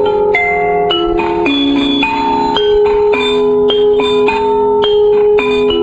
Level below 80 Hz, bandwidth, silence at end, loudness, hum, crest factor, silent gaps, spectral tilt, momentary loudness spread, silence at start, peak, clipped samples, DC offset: -36 dBFS; 8 kHz; 0 s; -11 LUFS; none; 10 dB; none; -5.5 dB/octave; 3 LU; 0 s; 0 dBFS; under 0.1%; under 0.1%